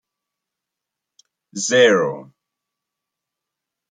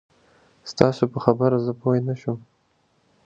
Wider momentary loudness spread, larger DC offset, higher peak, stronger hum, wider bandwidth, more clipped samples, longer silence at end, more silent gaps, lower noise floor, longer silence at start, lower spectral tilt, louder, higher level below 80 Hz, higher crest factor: first, 21 LU vs 15 LU; neither; about the same, -2 dBFS vs 0 dBFS; neither; first, 9.4 kHz vs 7.8 kHz; neither; first, 1.7 s vs 0.85 s; neither; first, -84 dBFS vs -65 dBFS; first, 1.55 s vs 0.65 s; second, -3 dB/octave vs -7.5 dB/octave; first, -16 LUFS vs -22 LUFS; second, -74 dBFS vs -58 dBFS; about the same, 22 dB vs 24 dB